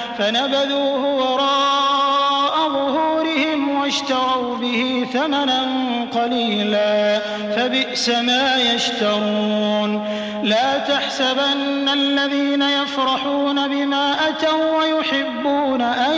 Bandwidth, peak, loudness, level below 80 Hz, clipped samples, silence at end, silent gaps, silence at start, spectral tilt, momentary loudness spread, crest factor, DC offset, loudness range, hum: 8 kHz; -6 dBFS; -18 LUFS; -60 dBFS; under 0.1%; 0 s; none; 0 s; -3.5 dB/octave; 4 LU; 12 dB; under 0.1%; 1 LU; none